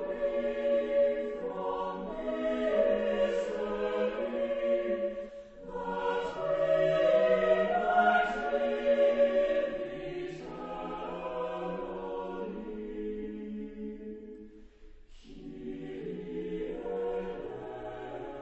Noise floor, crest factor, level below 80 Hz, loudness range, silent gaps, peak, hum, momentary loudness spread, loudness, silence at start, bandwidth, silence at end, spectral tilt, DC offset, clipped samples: -52 dBFS; 18 dB; -54 dBFS; 14 LU; none; -14 dBFS; none; 16 LU; -31 LUFS; 0 s; 8.2 kHz; 0 s; -6.5 dB/octave; under 0.1%; under 0.1%